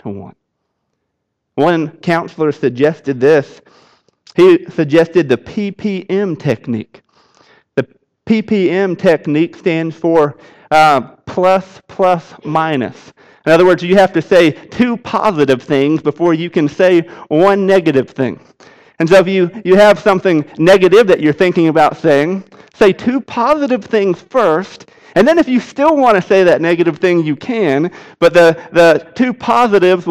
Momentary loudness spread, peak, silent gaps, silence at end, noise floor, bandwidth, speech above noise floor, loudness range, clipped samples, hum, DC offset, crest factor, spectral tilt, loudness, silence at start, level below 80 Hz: 10 LU; -2 dBFS; none; 0 s; -72 dBFS; 13 kHz; 60 dB; 5 LU; under 0.1%; none; under 0.1%; 12 dB; -6.5 dB/octave; -12 LUFS; 0.05 s; -50 dBFS